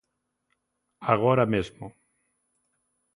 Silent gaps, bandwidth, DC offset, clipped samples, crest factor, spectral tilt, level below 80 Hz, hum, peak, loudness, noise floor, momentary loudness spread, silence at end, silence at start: none; 10.5 kHz; under 0.1%; under 0.1%; 24 dB; -8 dB/octave; -56 dBFS; none; -4 dBFS; -24 LUFS; -79 dBFS; 22 LU; 1.25 s; 1 s